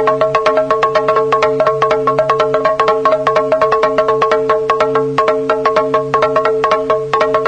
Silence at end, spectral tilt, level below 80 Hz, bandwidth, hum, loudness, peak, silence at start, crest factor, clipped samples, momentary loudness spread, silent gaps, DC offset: 0 s; -5.5 dB/octave; -46 dBFS; 9 kHz; none; -13 LUFS; 0 dBFS; 0 s; 12 dB; under 0.1%; 2 LU; none; under 0.1%